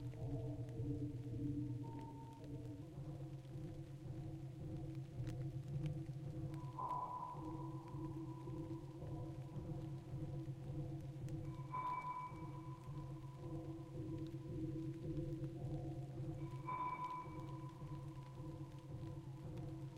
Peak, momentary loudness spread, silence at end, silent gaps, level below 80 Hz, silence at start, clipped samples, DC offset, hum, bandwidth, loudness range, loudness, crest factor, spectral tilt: -32 dBFS; 7 LU; 0 s; none; -62 dBFS; 0 s; under 0.1%; under 0.1%; none; 12.5 kHz; 2 LU; -49 LUFS; 14 dB; -8.5 dB/octave